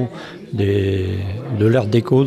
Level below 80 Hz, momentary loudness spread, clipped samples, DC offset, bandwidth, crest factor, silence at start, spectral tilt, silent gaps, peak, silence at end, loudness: -50 dBFS; 11 LU; under 0.1%; under 0.1%; 12 kHz; 14 dB; 0 s; -8.5 dB/octave; none; -4 dBFS; 0 s; -19 LUFS